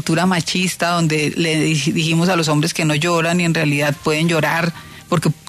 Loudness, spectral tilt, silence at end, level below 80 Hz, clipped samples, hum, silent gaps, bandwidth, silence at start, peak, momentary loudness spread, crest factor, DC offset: -17 LUFS; -4.5 dB/octave; 0.1 s; -52 dBFS; under 0.1%; none; none; 14 kHz; 0 s; -4 dBFS; 3 LU; 12 dB; under 0.1%